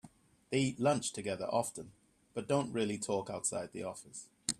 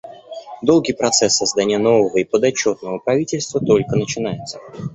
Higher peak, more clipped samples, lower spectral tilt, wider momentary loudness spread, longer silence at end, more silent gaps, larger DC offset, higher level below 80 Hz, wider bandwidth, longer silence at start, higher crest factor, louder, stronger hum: second, -14 dBFS vs 0 dBFS; neither; about the same, -4 dB/octave vs -4 dB/octave; about the same, 14 LU vs 15 LU; about the same, 0.05 s vs 0 s; neither; neither; second, -72 dBFS vs -52 dBFS; first, 14.5 kHz vs 8.4 kHz; about the same, 0.05 s vs 0.05 s; about the same, 22 dB vs 18 dB; second, -36 LUFS vs -17 LUFS; neither